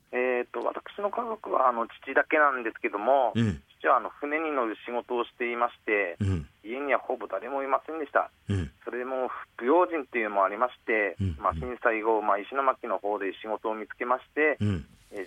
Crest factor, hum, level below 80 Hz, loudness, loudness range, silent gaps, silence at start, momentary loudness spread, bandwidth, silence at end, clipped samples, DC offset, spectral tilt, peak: 20 dB; none; -56 dBFS; -28 LUFS; 4 LU; none; 0.1 s; 9 LU; 10.5 kHz; 0 s; under 0.1%; under 0.1%; -7.5 dB/octave; -8 dBFS